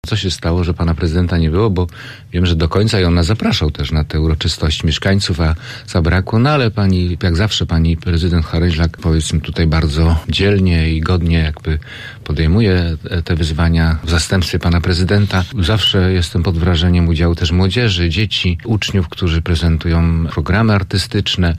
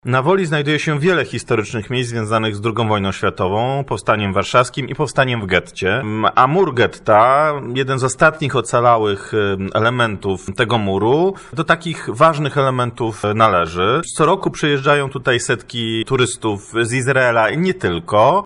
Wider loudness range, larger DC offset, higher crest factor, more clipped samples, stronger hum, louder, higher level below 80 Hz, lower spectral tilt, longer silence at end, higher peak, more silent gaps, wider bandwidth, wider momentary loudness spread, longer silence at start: about the same, 2 LU vs 3 LU; neither; second, 10 dB vs 16 dB; neither; neither; about the same, -15 LUFS vs -16 LUFS; first, -24 dBFS vs -48 dBFS; about the same, -6 dB/octave vs -5 dB/octave; about the same, 0 s vs 0 s; second, -4 dBFS vs 0 dBFS; neither; about the same, 11.5 kHz vs 11.5 kHz; about the same, 5 LU vs 7 LU; about the same, 0.05 s vs 0.05 s